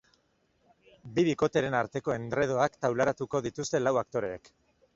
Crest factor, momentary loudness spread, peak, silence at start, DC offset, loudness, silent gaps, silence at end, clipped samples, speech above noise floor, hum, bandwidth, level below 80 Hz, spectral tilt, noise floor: 20 dB; 7 LU; -10 dBFS; 1.05 s; under 0.1%; -29 LUFS; none; 0.6 s; under 0.1%; 42 dB; none; 7.8 kHz; -62 dBFS; -5.5 dB/octave; -71 dBFS